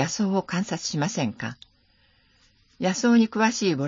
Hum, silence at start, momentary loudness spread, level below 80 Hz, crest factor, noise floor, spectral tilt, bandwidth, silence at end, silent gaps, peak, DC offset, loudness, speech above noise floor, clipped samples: none; 0 s; 9 LU; -64 dBFS; 16 dB; -62 dBFS; -4.5 dB/octave; 7.6 kHz; 0 s; none; -8 dBFS; under 0.1%; -24 LUFS; 39 dB; under 0.1%